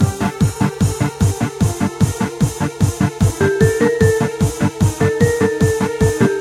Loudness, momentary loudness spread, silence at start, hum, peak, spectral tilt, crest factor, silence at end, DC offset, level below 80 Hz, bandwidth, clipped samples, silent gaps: -17 LUFS; 4 LU; 0 s; none; 0 dBFS; -6.5 dB/octave; 14 dB; 0 s; under 0.1%; -34 dBFS; 16 kHz; under 0.1%; none